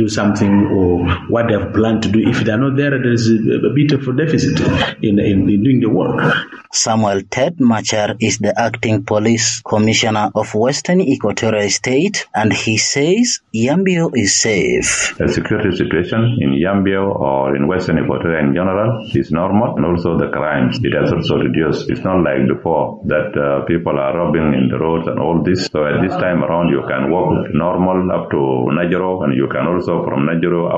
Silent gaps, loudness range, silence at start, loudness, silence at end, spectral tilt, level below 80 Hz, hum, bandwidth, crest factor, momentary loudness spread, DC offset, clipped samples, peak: none; 2 LU; 0 s; -15 LUFS; 0 s; -5 dB/octave; -40 dBFS; none; 11.5 kHz; 14 dB; 4 LU; under 0.1%; under 0.1%; -2 dBFS